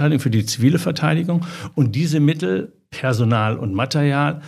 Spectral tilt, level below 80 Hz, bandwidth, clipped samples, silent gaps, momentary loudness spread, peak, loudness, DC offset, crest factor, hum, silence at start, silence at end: -6.5 dB/octave; -58 dBFS; 14 kHz; under 0.1%; none; 6 LU; -2 dBFS; -19 LUFS; under 0.1%; 16 dB; none; 0 s; 0 s